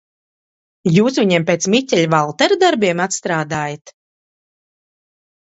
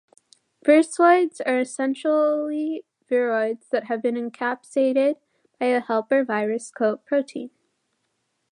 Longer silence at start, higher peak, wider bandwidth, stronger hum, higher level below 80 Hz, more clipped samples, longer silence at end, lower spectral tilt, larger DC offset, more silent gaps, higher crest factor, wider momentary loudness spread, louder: first, 0.85 s vs 0.65 s; first, 0 dBFS vs -4 dBFS; second, 8.2 kHz vs 11 kHz; neither; first, -60 dBFS vs -82 dBFS; neither; first, 1.65 s vs 1.05 s; about the same, -4.5 dB/octave vs -4.5 dB/octave; neither; first, 3.81-3.85 s vs none; about the same, 18 dB vs 18 dB; about the same, 9 LU vs 10 LU; first, -16 LUFS vs -22 LUFS